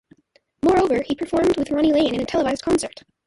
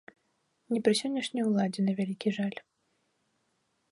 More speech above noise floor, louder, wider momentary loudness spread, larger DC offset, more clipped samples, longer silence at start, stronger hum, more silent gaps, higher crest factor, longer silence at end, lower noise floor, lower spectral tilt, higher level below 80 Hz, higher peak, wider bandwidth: second, 42 dB vs 47 dB; first, -20 LUFS vs -30 LUFS; about the same, 5 LU vs 7 LU; neither; neither; about the same, 0.65 s vs 0.7 s; neither; neither; second, 14 dB vs 20 dB; second, 0.4 s vs 1.3 s; second, -62 dBFS vs -76 dBFS; about the same, -5 dB/octave vs -5.5 dB/octave; first, -46 dBFS vs -76 dBFS; first, -8 dBFS vs -12 dBFS; about the same, 11.5 kHz vs 11.5 kHz